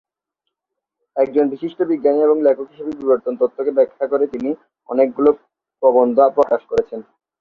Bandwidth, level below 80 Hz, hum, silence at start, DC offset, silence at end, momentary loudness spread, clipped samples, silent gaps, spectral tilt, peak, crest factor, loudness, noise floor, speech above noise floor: 6.6 kHz; -58 dBFS; none; 1.15 s; under 0.1%; 0.4 s; 11 LU; under 0.1%; none; -8 dB/octave; -2 dBFS; 16 dB; -17 LUFS; -81 dBFS; 65 dB